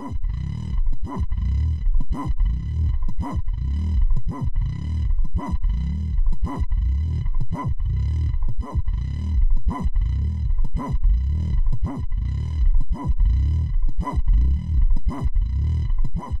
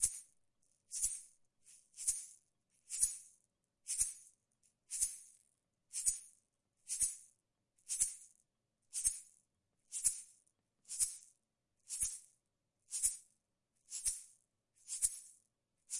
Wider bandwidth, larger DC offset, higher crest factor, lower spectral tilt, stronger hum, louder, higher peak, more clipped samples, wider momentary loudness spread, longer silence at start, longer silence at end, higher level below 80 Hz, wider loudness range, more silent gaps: second, 5.2 kHz vs 11.5 kHz; first, 2% vs under 0.1%; second, 10 dB vs 28 dB; first, -9 dB/octave vs 2.5 dB/octave; neither; first, -25 LUFS vs -38 LUFS; first, -8 dBFS vs -16 dBFS; neither; second, 5 LU vs 15 LU; about the same, 0 s vs 0 s; about the same, 0 s vs 0 s; first, -20 dBFS vs -68 dBFS; about the same, 2 LU vs 1 LU; neither